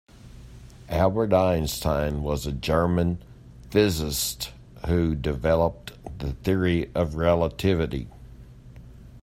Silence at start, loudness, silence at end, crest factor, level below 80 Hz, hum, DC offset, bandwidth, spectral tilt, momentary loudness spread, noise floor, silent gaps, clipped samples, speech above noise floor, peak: 0.25 s; -25 LUFS; 0.05 s; 18 dB; -40 dBFS; none; under 0.1%; 16 kHz; -5.5 dB/octave; 13 LU; -45 dBFS; none; under 0.1%; 22 dB; -6 dBFS